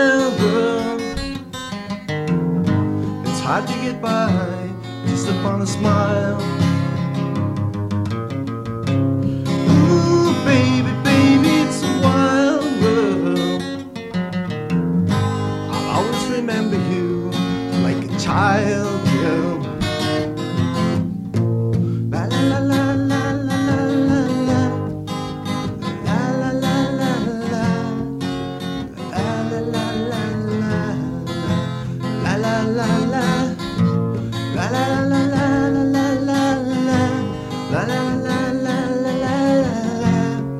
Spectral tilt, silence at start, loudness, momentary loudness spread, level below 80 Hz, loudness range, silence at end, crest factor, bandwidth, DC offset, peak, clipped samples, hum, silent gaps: -6.5 dB/octave; 0 s; -19 LUFS; 9 LU; -46 dBFS; 6 LU; 0 s; 16 dB; 13 kHz; under 0.1%; -2 dBFS; under 0.1%; none; none